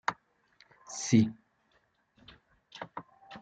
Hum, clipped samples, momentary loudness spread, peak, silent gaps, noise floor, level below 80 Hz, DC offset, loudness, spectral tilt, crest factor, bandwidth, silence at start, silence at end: none; under 0.1%; 26 LU; -12 dBFS; none; -72 dBFS; -74 dBFS; under 0.1%; -30 LUFS; -5 dB/octave; 24 dB; 9 kHz; 0.1 s; 0.05 s